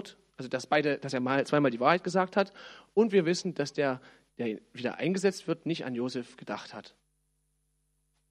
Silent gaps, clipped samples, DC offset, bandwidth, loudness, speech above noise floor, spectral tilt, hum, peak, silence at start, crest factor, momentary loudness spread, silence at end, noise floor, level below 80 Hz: none; under 0.1%; under 0.1%; 12.5 kHz; -30 LUFS; 46 dB; -5.5 dB/octave; 50 Hz at -60 dBFS; -8 dBFS; 0 s; 22 dB; 14 LU; 1.4 s; -75 dBFS; -76 dBFS